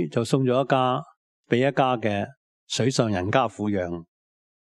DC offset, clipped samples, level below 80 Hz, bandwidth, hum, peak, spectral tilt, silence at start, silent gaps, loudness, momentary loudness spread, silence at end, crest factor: under 0.1%; under 0.1%; -64 dBFS; 12 kHz; none; -4 dBFS; -5.5 dB/octave; 0 s; 1.17-1.44 s, 2.37-2.67 s; -24 LUFS; 9 LU; 0.75 s; 20 dB